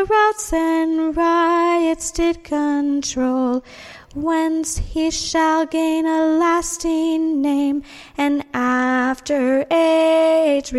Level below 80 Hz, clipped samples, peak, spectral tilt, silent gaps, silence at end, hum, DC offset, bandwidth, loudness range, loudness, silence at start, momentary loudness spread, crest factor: -40 dBFS; under 0.1%; -6 dBFS; -3.5 dB/octave; none; 0 s; none; under 0.1%; 13 kHz; 3 LU; -18 LUFS; 0 s; 7 LU; 12 dB